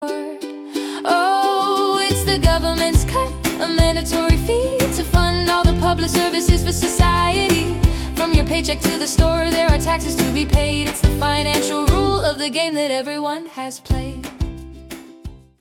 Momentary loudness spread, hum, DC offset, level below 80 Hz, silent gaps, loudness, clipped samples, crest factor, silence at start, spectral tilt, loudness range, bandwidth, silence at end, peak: 11 LU; none; under 0.1%; -24 dBFS; none; -18 LUFS; under 0.1%; 16 dB; 0 s; -4.5 dB/octave; 3 LU; 18 kHz; 0.25 s; -2 dBFS